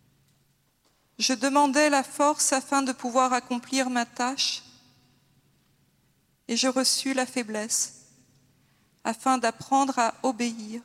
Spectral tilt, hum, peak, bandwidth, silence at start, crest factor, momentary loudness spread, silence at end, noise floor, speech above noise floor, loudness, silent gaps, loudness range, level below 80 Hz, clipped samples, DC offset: -1.5 dB/octave; none; -8 dBFS; 16 kHz; 1.2 s; 20 dB; 8 LU; 0.05 s; -68 dBFS; 42 dB; -25 LUFS; none; 5 LU; -78 dBFS; under 0.1%; under 0.1%